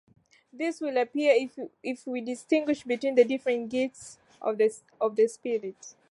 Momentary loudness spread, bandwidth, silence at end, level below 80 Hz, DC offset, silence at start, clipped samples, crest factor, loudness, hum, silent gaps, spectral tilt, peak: 13 LU; 11.5 kHz; 0.2 s; -76 dBFS; under 0.1%; 0.55 s; under 0.1%; 20 dB; -28 LUFS; none; none; -4 dB/octave; -10 dBFS